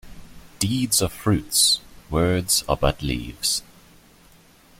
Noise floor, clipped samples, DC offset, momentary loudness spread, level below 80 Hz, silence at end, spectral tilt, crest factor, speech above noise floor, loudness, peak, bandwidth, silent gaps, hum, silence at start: -52 dBFS; under 0.1%; under 0.1%; 10 LU; -40 dBFS; 1.15 s; -3.5 dB/octave; 20 dB; 31 dB; -21 LUFS; -4 dBFS; 16.5 kHz; none; none; 0.05 s